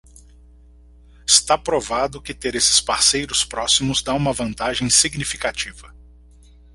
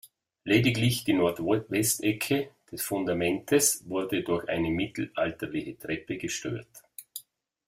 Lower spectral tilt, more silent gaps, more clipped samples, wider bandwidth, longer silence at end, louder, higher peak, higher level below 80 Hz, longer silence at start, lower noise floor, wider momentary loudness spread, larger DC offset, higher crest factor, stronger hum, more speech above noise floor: second, -1.5 dB/octave vs -4 dB/octave; neither; neither; about the same, 16 kHz vs 16 kHz; first, 0.85 s vs 0.45 s; first, -18 LUFS vs -28 LUFS; first, 0 dBFS vs -8 dBFS; first, -44 dBFS vs -58 dBFS; first, 1.25 s vs 0.05 s; second, -47 dBFS vs -56 dBFS; second, 11 LU vs 16 LU; neither; about the same, 22 dB vs 20 dB; neither; about the same, 27 dB vs 28 dB